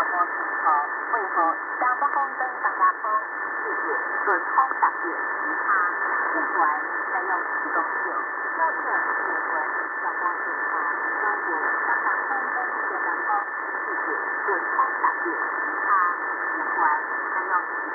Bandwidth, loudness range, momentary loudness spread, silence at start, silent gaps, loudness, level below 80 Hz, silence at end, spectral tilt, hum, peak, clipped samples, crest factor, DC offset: 2.9 kHz; 1 LU; 4 LU; 0 s; none; -24 LUFS; -90 dBFS; 0 s; -6.5 dB/octave; none; -8 dBFS; under 0.1%; 18 dB; under 0.1%